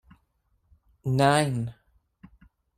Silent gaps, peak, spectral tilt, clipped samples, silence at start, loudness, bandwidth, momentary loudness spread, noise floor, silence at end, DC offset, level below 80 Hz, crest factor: none; -8 dBFS; -5.5 dB/octave; under 0.1%; 1.05 s; -25 LUFS; 15.5 kHz; 15 LU; -71 dBFS; 1.05 s; under 0.1%; -58 dBFS; 22 dB